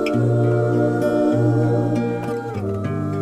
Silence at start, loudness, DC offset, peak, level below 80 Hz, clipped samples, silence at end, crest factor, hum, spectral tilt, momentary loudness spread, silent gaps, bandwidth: 0 s; -20 LUFS; under 0.1%; -6 dBFS; -50 dBFS; under 0.1%; 0 s; 12 dB; none; -9 dB/octave; 7 LU; none; 10 kHz